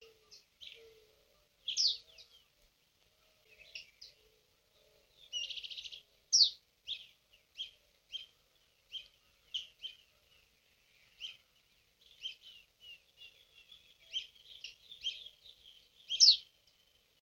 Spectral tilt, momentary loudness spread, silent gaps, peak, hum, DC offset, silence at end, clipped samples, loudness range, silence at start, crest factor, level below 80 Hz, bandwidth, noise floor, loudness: 4 dB/octave; 29 LU; none; -12 dBFS; none; under 0.1%; 0.8 s; under 0.1%; 20 LU; 0.6 s; 30 dB; -80 dBFS; 16.5 kHz; -73 dBFS; -32 LUFS